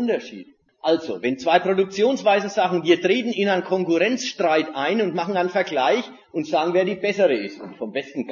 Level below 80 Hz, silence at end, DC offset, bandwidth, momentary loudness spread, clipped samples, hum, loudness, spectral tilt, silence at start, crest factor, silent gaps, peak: -70 dBFS; 0 s; under 0.1%; 7.4 kHz; 10 LU; under 0.1%; none; -21 LUFS; -5 dB/octave; 0 s; 18 dB; none; -4 dBFS